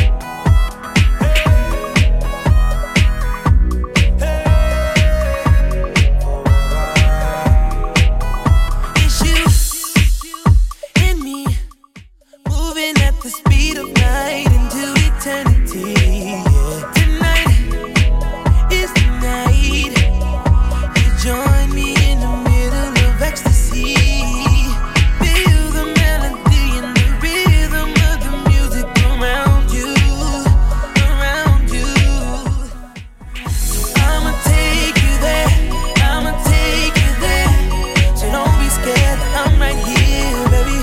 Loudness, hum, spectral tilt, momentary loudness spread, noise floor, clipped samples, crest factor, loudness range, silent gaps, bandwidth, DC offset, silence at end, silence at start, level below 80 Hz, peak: -15 LUFS; none; -5 dB/octave; 4 LU; -42 dBFS; under 0.1%; 12 dB; 2 LU; none; 16 kHz; under 0.1%; 0 s; 0 s; -16 dBFS; 0 dBFS